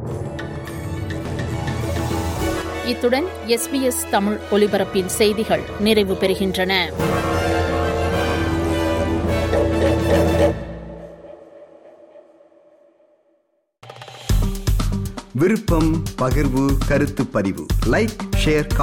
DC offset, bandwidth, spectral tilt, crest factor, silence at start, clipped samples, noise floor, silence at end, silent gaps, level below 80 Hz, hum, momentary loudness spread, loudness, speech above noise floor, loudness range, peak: under 0.1%; 17 kHz; -5.5 dB/octave; 16 dB; 0 s; under 0.1%; -66 dBFS; 0 s; none; -30 dBFS; none; 11 LU; -20 LUFS; 47 dB; 8 LU; -4 dBFS